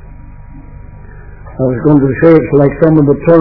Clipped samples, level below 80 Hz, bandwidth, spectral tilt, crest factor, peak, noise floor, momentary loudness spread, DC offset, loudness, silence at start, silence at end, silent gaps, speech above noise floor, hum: 1%; -32 dBFS; 5.4 kHz; -12.5 dB/octave; 10 dB; 0 dBFS; -30 dBFS; 9 LU; under 0.1%; -9 LUFS; 0.1 s; 0 s; none; 23 dB; 50 Hz at -35 dBFS